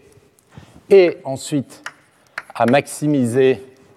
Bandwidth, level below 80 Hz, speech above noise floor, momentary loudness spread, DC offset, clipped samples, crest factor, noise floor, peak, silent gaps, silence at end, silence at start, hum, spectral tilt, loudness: 13.5 kHz; -64 dBFS; 36 dB; 21 LU; under 0.1%; under 0.1%; 16 dB; -51 dBFS; -2 dBFS; none; 0.3 s; 0.9 s; none; -6 dB/octave; -17 LUFS